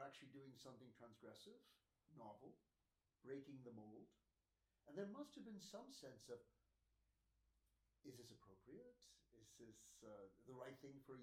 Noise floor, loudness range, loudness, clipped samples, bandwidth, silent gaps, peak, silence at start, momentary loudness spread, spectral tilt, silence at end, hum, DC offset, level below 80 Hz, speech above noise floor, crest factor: under -90 dBFS; 7 LU; -61 LUFS; under 0.1%; 15.5 kHz; none; -38 dBFS; 0 s; 10 LU; -5 dB/octave; 0 s; none; under 0.1%; -88 dBFS; over 29 dB; 24 dB